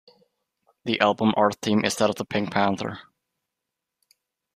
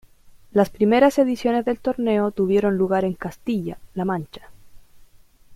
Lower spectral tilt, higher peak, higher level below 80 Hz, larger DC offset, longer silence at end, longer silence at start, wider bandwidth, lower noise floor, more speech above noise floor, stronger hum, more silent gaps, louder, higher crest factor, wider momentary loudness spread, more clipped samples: second, -4.5 dB/octave vs -7 dB/octave; about the same, -4 dBFS vs -2 dBFS; second, -64 dBFS vs -52 dBFS; neither; first, 1.55 s vs 0 s; first, 0.85 s vs 0.55 s; about the same, 15 kHz vs 15 kHz; first, -84 dBFS vs -50 dBFS; first, 61 dB vs 30 dB; neither; neither; about the same, -23 LUFS vs -21 LUFS; about the same, 22 dB vs 20 dB; about the same, 12 LU vs 12 LU; neither